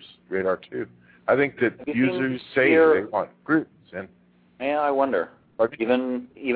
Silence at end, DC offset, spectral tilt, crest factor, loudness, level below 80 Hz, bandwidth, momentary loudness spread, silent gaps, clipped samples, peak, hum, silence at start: 0 s; under 0.1%; -10 dB/octave; 18 dB; -23 LUFS; -66 dBFS; 4.8 kHz; 16 LU; none; under 0.1%; -6 dBFS; none; 0 s